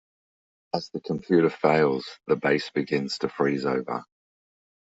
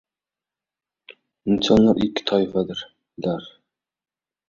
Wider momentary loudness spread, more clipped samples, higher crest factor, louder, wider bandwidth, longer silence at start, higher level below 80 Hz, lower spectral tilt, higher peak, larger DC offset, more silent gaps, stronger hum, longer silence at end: second, 11 LU vs 16 LU; neither; about the same, 22 dB vs 20 dB; second, -26 LUFS vs -21 LUFS; about the same, 8 kHz vs 7.4 kHz; second, 0.75 s vs 1.1 s; second, -66 dBFS vs -50 dBFS; about the same, -6.5 dB/octave vs -6.5 dB/octave; about the same, -4 dBFS vs -4 dBFS; neither; neither; neither; about the same, 0.95 s vs 1 s